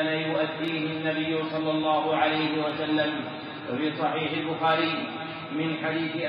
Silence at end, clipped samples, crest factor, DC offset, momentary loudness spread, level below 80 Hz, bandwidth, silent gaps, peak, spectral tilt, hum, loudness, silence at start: 0 s; under 0.1%; 16 dB; under 0.1%; 9 LU; -74 dBFS; 5.2 kHz; none; -10 dBFS; -3 dB/octave; none; -27 LUFS; 0 s